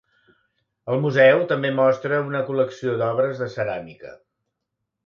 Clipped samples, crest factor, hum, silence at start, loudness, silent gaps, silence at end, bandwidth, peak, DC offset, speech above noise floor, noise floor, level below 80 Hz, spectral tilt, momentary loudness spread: under 0.1%; 18 dB; none; 0.85 s; -21 LUFS; none; 0.9 s; 7 kHz; -4 dBFS; under 0.1%; 60 dB; -80 dBFS; -66 dBFS; -7 dB/octave; 12 LU